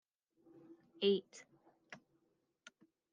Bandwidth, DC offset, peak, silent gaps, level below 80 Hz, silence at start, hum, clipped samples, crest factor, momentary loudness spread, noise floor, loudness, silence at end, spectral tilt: 8.8 kHz; under 0.1%; -22 dBFS; none; under -90 dBFS; 0.7 s; none; under 0.1%; 22 dB; 26 LU; -81 dBFS; -37 LUFS; 1.15 s; -5 dB/octave